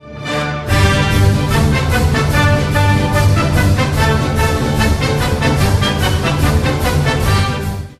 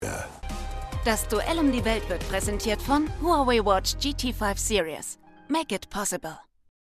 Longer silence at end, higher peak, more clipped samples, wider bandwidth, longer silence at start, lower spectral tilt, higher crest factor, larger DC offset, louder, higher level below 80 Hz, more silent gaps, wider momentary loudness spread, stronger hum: second, 0.05 s vs 0.55 s; first, 0 dBFS vs -8 dBFS; neither; about the same, 14 kHz vs 14.5 kHz; about the same, 0.05 s vs 0 s; first, -5.5 dB/octave vs -4 dB/octave; second, 12 dB vs 18 dB; neither; first, -14 LUFS vs -26 LUFS; first, -22 dBFS vs -36 dBFS; neither; second, 3 LU vs 13 LU; neither